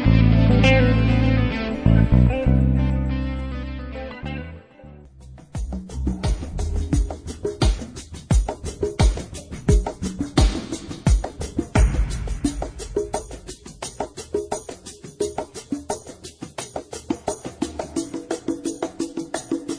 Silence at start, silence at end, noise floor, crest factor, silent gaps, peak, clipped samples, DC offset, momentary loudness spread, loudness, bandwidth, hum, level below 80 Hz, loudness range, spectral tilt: 0 s; 0 s; -44 dBFS; 18 dB; none; -4 dBFS; under 0.1%; under 0.1%; 17 LU; -23 LUFS; 10.5 kHz; none; -26 dBFS; 11 LU; -6.5 dB/octave